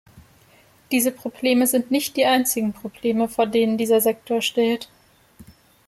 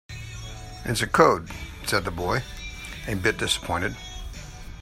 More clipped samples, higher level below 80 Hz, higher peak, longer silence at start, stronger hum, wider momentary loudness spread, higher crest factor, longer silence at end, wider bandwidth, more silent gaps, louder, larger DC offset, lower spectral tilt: neither; second, -62 dBFS vs -42 dBFS; second, -6 dBFS vs -2 dBFS; about the same, 0.15 s vs 0.1 s; neither; second, 7 LU vs 19 LU; second, 16 dB vs 26 dB; first, 0.45 s vs 0 s; about the same, 16 kHz vs 16 kHz; neither; first, -21 LUFS vs -25 LUFS; neither; about the same, -3 dB/octave vs -4 dB/octave